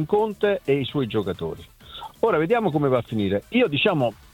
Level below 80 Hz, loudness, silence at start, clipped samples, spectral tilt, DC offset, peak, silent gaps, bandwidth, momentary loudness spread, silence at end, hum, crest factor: -54 dBFS; -23 LUFS; 0 s; under 0.1%; -7.5 dB/octave; under 0.1%; -6 dBFS; none; 17 kHz; 13 LU; 0.2 s; none; 16 dB